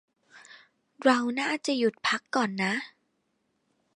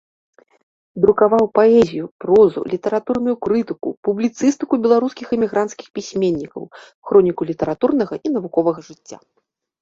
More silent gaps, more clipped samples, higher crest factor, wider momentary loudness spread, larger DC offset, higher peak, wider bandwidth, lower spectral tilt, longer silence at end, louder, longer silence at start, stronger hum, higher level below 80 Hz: second, none vs 2.11-2.19 s, 3.97-4.03 s, 5.90-5.94 s, 6.94-7.02 s; neither; first, 22 dB vs 16 dB; second, 5 LU vs 13 LU; neither; second, -8 dBFS vs -2 dBFS; first, 11 kHz vs 7.8 kHz; second, -4 dB/octave vs -6.5 dB/octave; first, 1.1 s vs 0.65 s; second, -27 LUFS vs -18 LUFS; second, 0.35 s vs 0.95 s; neither; second, -80 dBFS vs -54 dBFS